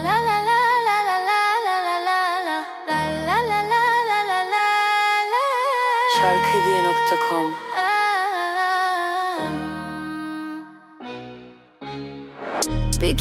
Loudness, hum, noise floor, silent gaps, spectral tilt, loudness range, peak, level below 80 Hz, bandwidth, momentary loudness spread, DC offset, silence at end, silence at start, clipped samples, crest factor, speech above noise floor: -20 LUFS; none; -44 dBFS; none; -3.5 dB/octave; 10 LU; -4 dBFS; -40 dBFS; 16.5 kHz; 16 LU; under 0.1%; 0 s; 0 s; under 0.1%; 18 dB; 24 dB